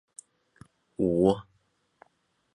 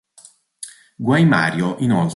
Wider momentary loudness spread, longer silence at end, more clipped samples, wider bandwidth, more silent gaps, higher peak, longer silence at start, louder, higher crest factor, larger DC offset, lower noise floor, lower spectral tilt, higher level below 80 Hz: first, 26 LU vs 21 LU; first, 1.1 s vs 0 s; neither; about the same, 11 kHz vs 11.5 kHz; neither; second, -10 dBFS vs -2 dBFS; first, 1 s vs 0.6 s; second, -26 LUFS vs -17 LUFS; first, 22 dB vs 16 dB; neither; first, -72 dBFS vs -49 dBFS; about the same, -7.5 dB/octave vs -6.5 dB/octave; about the same, -56 dBFS vs -58 dBFS